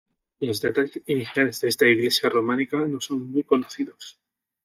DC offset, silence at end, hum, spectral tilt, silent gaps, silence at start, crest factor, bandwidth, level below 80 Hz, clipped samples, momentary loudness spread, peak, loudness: under 0.1%; 0.55 s; none; -4 dB/octave; none; 0.4 s; 18 dB; 16 kHz; -68 dBFS; under 0.1%; 13 LU; -6 dBFS; -23 LUFS